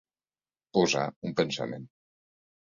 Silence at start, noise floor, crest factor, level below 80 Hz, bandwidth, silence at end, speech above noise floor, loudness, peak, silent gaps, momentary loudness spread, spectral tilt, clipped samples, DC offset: 0.75 s; under -90 dBFS; 22 dB; -68 dBFS; 7.8 kHz; 0.85 s; over 61 dB; -29 LUFS; -10 dBFS; 1.16-1.22 s; 11 LU; -4.5 dB/octave; under 0.1%; under 0.1%